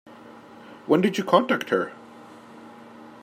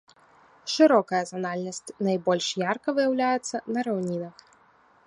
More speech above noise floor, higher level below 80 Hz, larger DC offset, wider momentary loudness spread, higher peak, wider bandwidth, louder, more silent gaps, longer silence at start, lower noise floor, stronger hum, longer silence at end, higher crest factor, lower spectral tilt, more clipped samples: second, 24 dB vs 34 dB; about the same, -74 dBFS vs -76 dBFS; neither; first, 25 LU vs 13 LU; about the same, -4 dBFS vs -6 dBFS; first, 16 kHz vs 11 kHz; first, -23 LUFS vs -26 LUFS; neither; second, 0.1 s vs 0.65 s; second, -46 dBFS vs -60 dBFS; neither; second, 0.1 s vs 0.75 s; about the same, 24 dB vs 20 dB; first, -6 dB/octave vs -4.5 dB/octave; neither